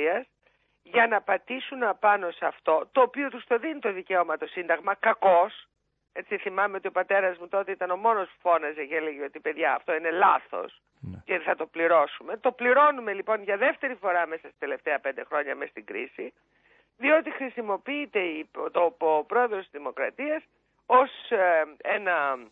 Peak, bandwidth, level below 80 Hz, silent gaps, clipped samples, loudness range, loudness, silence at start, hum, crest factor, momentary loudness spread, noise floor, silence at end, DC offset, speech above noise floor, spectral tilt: -8 dBFS; 4 kHz; -74 dBFS; none; under 0.1%; 5 LU; -26 LUFS; 0 s; none; 18 dB; 12 LU; -68 dBFS; 0.05 s; under 0.1%; 42 dB; -7.5 dB/octave